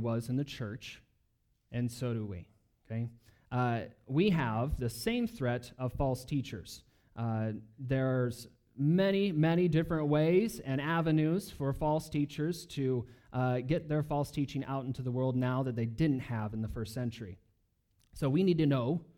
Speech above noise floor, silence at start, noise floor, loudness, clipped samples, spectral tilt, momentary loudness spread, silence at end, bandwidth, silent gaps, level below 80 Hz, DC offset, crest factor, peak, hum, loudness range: 43 dB; 0 s; -75 dBFS; -33 LUFS; under 0.1%; -7.5 dB/octave; 13 LU; 0.15 s; 18 kHz; none; -54 dBFS; under 0.1%; 16 dB; -16 dBFS; none; 6 LU